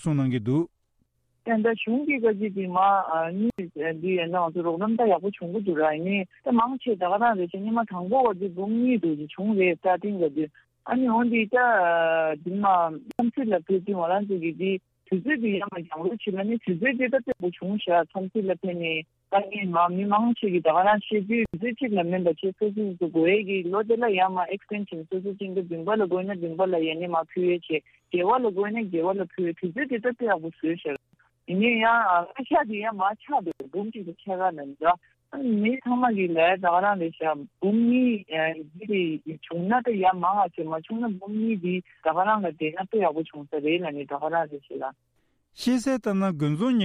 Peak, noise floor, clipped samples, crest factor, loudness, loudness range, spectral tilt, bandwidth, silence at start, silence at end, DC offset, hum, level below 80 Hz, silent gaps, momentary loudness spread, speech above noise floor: -10 dBFS; -71 dBFS; under 0.1%; 14 dB; -25 LUFS; 4 LU; -7 dB/octave; 11.5 kHz; 0 s; 0 s; under 0.1%; none; -66 dBFS; none; 9 LU; 46 dB